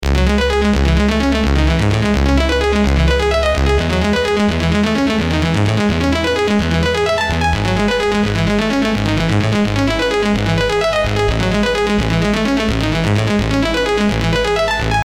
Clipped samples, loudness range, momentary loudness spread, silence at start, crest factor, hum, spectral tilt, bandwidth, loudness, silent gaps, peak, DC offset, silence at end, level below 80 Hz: under 0.1%; 1 LU; 2 LU; 0 s; 12 dB; none; -6 dB/octave; 15 kHz; -15 LUFS; none; -2 dBFS; under 0.1%; 0.05 s; -22 dBFS